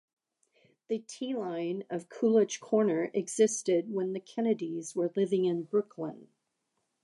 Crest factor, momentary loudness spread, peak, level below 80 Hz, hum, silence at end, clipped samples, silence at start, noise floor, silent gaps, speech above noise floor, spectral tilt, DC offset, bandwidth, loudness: 18 dB; 10 LU; -14 dBFS; -86 dBFS; none; 0.8 s; under 0.1%; 0.9 s; -81 dBFS; none; 51 dB; -5 dB/octave; under 0.1%; 11.5 kHz; -31 LUFS